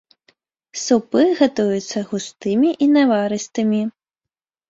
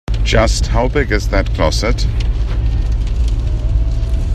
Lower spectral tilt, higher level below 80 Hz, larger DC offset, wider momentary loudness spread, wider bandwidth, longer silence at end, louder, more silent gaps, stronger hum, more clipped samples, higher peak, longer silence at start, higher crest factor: about the same, -5 dB/octave vs -5.5 dB/octave; second, -64 dBFS vs -16 dBFS; neither; first, 11 LU vs 5 LU; second, 8 kHz vs 9.8 kHz; first, 0.8 s vs 0 s; about the same, -18 LUFS vs -17 LUFS; neither; neither; neither; about the same, -2 dBFS vs 0 dBFS; first, 0.75 s vs 0.1 s; about the same, 16 dB vs 14 dB